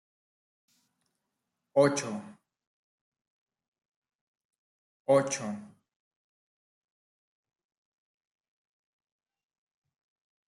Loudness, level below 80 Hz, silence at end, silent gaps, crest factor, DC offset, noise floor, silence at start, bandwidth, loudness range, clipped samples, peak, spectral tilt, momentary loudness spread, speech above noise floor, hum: -28 LUFS; -80 dBFS; 4.8 s; 2.67-3.12 s, 3.27-3.46 s, 3.68-3.72 s, 3.85-4.02 s, 4.15-4.34 s, 4.45-4.49 s, 4.58-5.05 s; 26 dB; under 0.1%; -85 dBFS; 1.75 s; 12 kHz; 8 LU; under 0.1%; -12 dBFS; -4.5 dB/octave; 16 LU; 58 dB; none